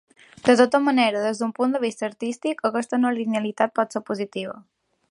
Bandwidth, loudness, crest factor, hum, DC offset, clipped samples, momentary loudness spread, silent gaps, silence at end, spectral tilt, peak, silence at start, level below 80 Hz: 11 kHz; -23 LUFS; 20 dB; none; under 0.1%; under 0.1%; 11 LU; none; 0.5 s; -4.5 dB/octave; -2 dBFS; 0.45 s; -70 dBFS